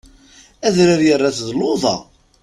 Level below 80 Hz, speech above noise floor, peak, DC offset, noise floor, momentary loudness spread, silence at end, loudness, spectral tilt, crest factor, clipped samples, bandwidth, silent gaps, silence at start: -50 dBFS; 32 dB; 0 dBFS; under 0.1%; -47 dBFS; 8 LU; 0.4 s; -16 LUFS; -5 dB/octave; 16 dB; under 0.1%; 12 kHz; none; 0.6 s